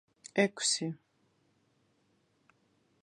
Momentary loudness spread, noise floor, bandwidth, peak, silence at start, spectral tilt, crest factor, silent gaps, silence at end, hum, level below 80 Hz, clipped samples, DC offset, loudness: 13 LU; -73 dBFS; 11 kHz; -12 dBFS; 0.25 s; -3 dB/octave; 26 dB; none; 2.05 s; none; -86 dBFS; under 0.1%; under 0.1%; -31 LUFS